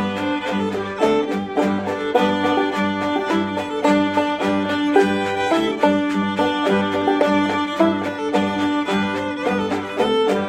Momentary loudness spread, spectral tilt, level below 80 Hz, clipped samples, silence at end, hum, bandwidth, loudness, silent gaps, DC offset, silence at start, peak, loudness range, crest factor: 5 LU; -5.5 dB/octave; -56 dBFS; under 0.1%; 0 s; none; 14 kHz; -20 LUFS; none; under 0.1%; 0 s; -2 dBFS; 2 LU; 18 dB